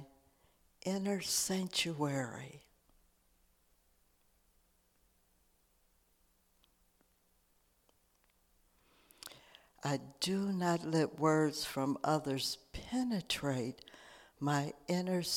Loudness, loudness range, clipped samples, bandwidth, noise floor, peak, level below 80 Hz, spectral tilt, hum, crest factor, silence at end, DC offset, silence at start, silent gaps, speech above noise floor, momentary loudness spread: -36 LUFS; 10 LU; under 0.1%; 18 kHz; -74 dBFS; -18 dBFS; -68 dBFS; -4.5 dB/octave; none; 22 dB; 0 s; under 0.1%; 0 s; none; 38 dB; 18 LU